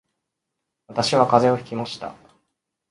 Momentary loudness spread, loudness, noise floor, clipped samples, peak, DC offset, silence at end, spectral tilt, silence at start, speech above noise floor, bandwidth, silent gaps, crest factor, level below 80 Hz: 16 LU; -21 LUFS; -81 dBFS; under 0.1%; 0 dBFS; under 0.1%; 0.8 s; -5 dB/octave; 0.9 s; 61 dB; 11.5 kHz; none; 24 dB; -62 dBFS